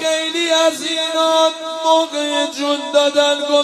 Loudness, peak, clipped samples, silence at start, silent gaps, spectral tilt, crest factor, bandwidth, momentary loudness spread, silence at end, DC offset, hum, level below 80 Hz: -16 LUFS; 0 dBFS; under 0.1%; 0 s; none; -0.5 dB/octave; 16 dB; 14.5 kHz; 5 LU; 0 s; under 0.1%; none; -74 dBFS